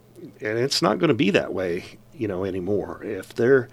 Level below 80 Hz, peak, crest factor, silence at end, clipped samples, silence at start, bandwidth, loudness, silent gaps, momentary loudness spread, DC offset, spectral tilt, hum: -56 dBFS; -2 dBFS; 22 dB; 0.05 s; under 0.1%; 0.15 s; 15 kHz; -24 LUFS; none; 12 LU; under 0.1%; -5 dB/octave; none